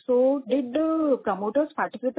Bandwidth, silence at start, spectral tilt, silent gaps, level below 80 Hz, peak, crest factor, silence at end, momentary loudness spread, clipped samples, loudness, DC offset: 4 kHz; 0.1 s; -10 dB/octave; none; -68 dBFS; -12 dBFS; 12 dB; 0.05 s; 5 LU; under 0.1%; -25 LUFS; under 0.1%